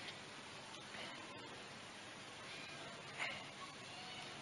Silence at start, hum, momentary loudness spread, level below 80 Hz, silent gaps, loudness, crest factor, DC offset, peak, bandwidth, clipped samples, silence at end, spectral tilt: 0 s; none; 7 LU; -82 dBFS; none; -50 LUFS; 20 dB; under 0.1%; -32 dBFS; 11.5 kHz; under 0.1%; 0 s; -2.5 dB/octave